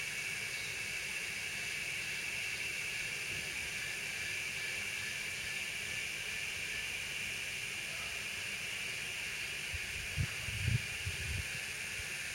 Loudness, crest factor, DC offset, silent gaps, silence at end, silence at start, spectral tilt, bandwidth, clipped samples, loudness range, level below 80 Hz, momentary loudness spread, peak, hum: -37 LUFS; 20 dB; under 0.1%; none; 0 s; 0 s; -1.5 dB/octave; 16.5 kHz; under 0.1%; 1 LU; -58 dBFS; 2 LU; -20 dBFS; none